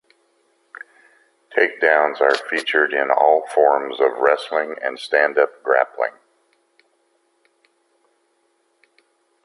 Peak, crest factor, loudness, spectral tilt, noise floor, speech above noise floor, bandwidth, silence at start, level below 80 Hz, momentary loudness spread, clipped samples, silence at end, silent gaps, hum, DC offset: 0 dBFS; 20 dB; -18 LUFS; -2.5 dB/octave; -65 dBFS; 47 dB; 11.5 kHz; 1.5 s; -76 dBFS; 10 LU; under 0.1%; 3.35 s; none; none; under 0.1%